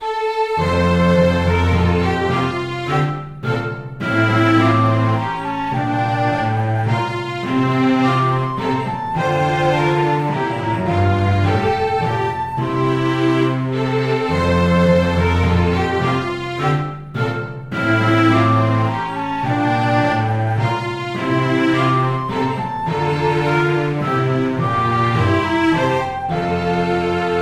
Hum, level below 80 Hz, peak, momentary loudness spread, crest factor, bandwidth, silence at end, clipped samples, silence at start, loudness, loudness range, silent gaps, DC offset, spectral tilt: none; -38 dBFS; -2 dBFS; 7 LU; 14 dB; 12 kHz; 0 s; under 0.1%; 0 s; -18 LUFS; 2 LU; none; under 0.1%; -7.5 dB/octave